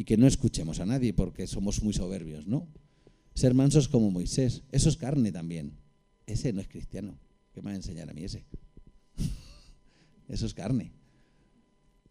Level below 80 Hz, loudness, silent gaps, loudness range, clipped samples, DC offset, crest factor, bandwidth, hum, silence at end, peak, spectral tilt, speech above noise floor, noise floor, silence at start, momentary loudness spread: -42 dBFS; -29 LUFS; none; 13 LU; under 0.1%; under 0.1%; 22 dB; 12.5 kHz; none; 1.2 s; -8 dBFS; -6.5 dB/octave; 37 dB; -65 dBFS; 0 s; 19 LU